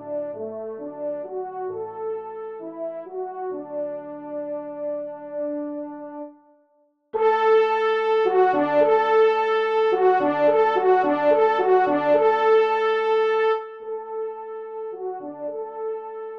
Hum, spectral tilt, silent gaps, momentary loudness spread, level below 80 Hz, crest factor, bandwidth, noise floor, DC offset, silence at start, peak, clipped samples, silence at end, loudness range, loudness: none; -6 dB/octave; none; 15 LU; -76 dBFS; 16 dB; 6 kHz; -64 dBFS; under 0.1%; 0 s; -6 dBFS; under 0.1%; 0 s; 13 LU; -22 LUFS